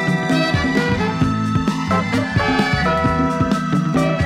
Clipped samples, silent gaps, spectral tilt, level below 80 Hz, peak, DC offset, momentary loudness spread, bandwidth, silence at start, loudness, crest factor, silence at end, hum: under 0.1%; none; -6.5 dB/octave; -36 dBFS; -2 dBFS; under 0.1%; 2 LU; 14 kHz; 0 s; -18 LUFS; 14 dB; 0 s; none